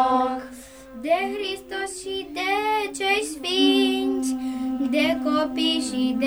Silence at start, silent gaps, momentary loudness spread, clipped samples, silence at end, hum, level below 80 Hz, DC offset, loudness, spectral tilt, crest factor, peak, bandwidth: 0 s; none; 10 LU; under 0.1%; 0 s; none; -56 dBFS; under 0.1%; -23 LUFS; -2.5 dB/octave; 16 dB; -8 dBFS; over 20 kHz